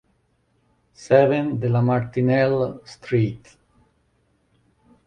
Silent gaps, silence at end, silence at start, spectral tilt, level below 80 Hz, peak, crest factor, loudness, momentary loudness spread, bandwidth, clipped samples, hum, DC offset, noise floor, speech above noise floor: none; 1.7 s; 1 s; -8 dB/octave; -56 dBFS; -4 dBFS; 20 dB; -21 LUFS; 10 LU; 9.2 kHz; under 0.1%; none; under 0.1%; -66 dBFS; 46 dB